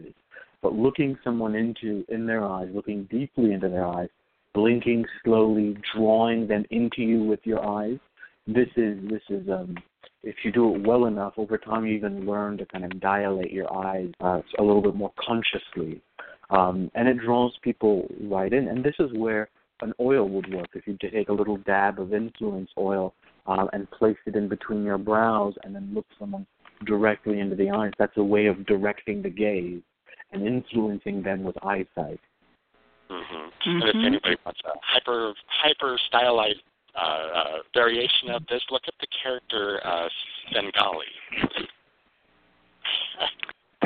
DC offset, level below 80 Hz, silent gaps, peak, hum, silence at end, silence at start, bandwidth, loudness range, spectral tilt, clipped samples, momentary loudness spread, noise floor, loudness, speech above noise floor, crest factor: under 0.1%; -58 dBFS; none; -4 dBFS; none; 0 s; 0 s; 4.7 kHz; 5 LU; -3 dB/octave; under 0.1%; 12 LU; -65 dBFS; -25 LUFS; 40 dB; 22 dB